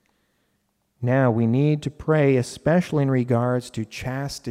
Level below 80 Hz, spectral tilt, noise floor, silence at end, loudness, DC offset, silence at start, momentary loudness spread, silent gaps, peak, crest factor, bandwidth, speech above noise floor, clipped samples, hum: -52 dBFS; -7.5 dB/octave; -71 dBFS; 0 s; -22 LUFS; under 0.1%; 1 s; 10 LU; none; -8 dBFS; 14 dB; 13.5 kHz; 50 dB; under 0.1%; none